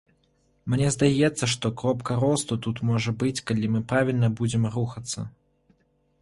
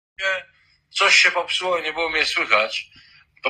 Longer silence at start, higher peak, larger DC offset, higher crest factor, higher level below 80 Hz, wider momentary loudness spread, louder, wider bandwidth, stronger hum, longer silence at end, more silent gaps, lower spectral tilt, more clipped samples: first, 0.65 s vs 0.2 s; second, -6 dBFS vs -2 dBFS; neither; about the same, 18 dB vs 20 dB; first, -54 dBFS vs -60 dBFS; second, 9 LU vs 13 LU; second, -25 LUFS vs -19 LUFS; second, 11.5 kHz vs 15 kHz; neither; first, 0.95 s vs 0 s; neither; first, -5.5 dB/octave vs 0.5 dB/octave; neither